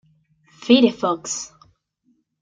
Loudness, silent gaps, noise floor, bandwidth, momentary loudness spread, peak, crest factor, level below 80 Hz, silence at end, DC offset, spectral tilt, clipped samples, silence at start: -19 LUFS; none; -66 dBFS; 9.2 kHz; 20 LU; -2 dBFS; 20 dB; -66 dBFS; 0.95 s; under 0.1%; -3.5 dB/octave; under 0.1%; 0.6 s